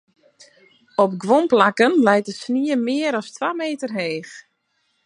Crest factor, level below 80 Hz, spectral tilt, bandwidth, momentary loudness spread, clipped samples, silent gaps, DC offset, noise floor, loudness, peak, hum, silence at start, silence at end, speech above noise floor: 20 dB; -74 dBFS; -5 dB/octave; 11 kHz; 11 LU; under 0.1%; none; under 0.1%; -69 dBFS; -19 LUFS; 0 dBFS; none; 1 s; 0.65 s; 50 dB